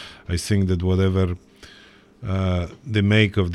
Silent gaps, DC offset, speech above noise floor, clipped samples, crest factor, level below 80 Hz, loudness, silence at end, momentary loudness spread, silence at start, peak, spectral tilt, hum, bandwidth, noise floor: none; under 0.1%; 29 dB; under 0.1%; 18 dB; -42 dBFS; -22 LUFS; 0 s; 11 LU; 0 s; -4 dBFS; -6.5 dB/octave; none; 12 kHz; -50 dBFS